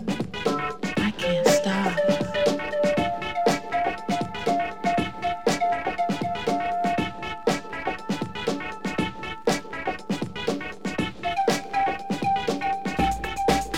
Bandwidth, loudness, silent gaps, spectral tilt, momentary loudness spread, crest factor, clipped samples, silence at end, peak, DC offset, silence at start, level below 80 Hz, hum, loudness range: 17 kHz; -26 LUFS; none; -4.5 dB/octave; 6 LU; 20 dB; under 0.1%; 0 s; -6 dBFS; 0.8%; 0 s; -46 dBFS; none; 5 LU